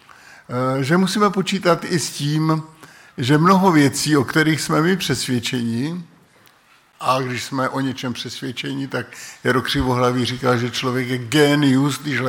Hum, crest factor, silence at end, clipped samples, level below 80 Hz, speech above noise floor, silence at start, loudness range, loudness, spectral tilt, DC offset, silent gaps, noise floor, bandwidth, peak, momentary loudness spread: none; 16 dB; 0 s; under 0.1%; -48 dBFS; 35 dB; 0.5 s; 7 LU; -19 LUFS; -5 dB/octave; under 0.1%; none; -54 dBFS; 17 kHz; -4 dBFS; 12 LU